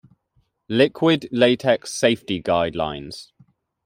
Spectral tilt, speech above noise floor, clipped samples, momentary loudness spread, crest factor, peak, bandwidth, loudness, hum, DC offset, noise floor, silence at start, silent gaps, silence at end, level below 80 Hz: -5 dB/octave; 46 dB; under 0.1%; 12 LU; 20 dB; -2 dBFS; 16 kHz; -20 LUFS; none; under 0.1%; -66 dBFS; 0.7 s; none; 0.65 s; -56 dBFS